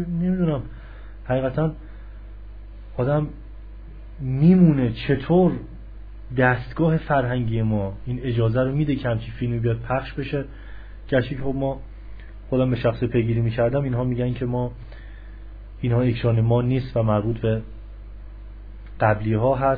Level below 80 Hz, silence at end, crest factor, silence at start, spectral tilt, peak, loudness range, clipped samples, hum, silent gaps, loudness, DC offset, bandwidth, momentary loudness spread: -38 dBFS; 0 s; 18 dB; 0 s; -11.5 dB/octave; -4 dBFS; 6 LU; under 0.1%; none; none; -22 LUFS; 0.3%; 5 kHz; 22 LU